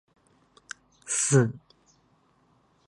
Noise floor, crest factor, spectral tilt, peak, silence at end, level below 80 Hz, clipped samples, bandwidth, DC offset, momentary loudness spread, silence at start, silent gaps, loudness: -65 dBFS; 22 dB; -4.5 dB/octave; -8 dBFS; 1.3 s; -68 dBFS; under 0.1%; 11.5 kHz; under 0.1%; 22 LU; 1.05 s; none; -24 LUFS